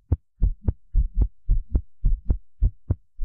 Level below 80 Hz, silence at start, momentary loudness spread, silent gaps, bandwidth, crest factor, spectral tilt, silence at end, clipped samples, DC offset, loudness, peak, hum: -24 dBFS; 0.1 s; 4 LU; none; 1.5 kHz; 12 dB; -14 dB/octave; 0 s; under 0.1%; under 0.1%; -29 LUFS; -12 dBFS; none